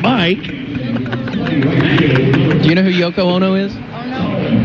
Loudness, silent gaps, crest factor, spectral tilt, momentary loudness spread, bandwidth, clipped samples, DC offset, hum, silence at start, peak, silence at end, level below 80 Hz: -14 LUFS; none; 12 dB; -8 dB/octave; 10 LU; 6.8 kHz; under 0.1%; under 0.1%; none; 0 s; -2 dBFS; 0 s; -42 dBFS